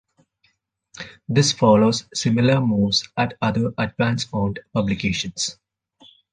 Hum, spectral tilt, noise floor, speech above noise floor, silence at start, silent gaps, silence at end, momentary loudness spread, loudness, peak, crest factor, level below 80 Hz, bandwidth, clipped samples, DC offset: none; -5 dB/octave; -66 dBFS; 46 dB; 0.95 s; none; 0.8 s; 10 LU; -20 LUFS; -4 dBFS; 18 dB; -48 dBFS; 9.8 kHz; under 0.1%; under 0.1%